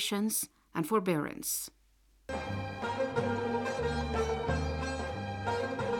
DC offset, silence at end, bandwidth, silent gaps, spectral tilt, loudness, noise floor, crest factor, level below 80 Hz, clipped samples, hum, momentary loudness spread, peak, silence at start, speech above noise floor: under 0.1%; 0 s; 19.5 kHz; none; -4.5 dB/octave; -34 LUFS; -66 dBFS; 18 dB; -48 dBFS; under 0.1%; none; 7 LU; -16 dBFS; 0 s; 33 dB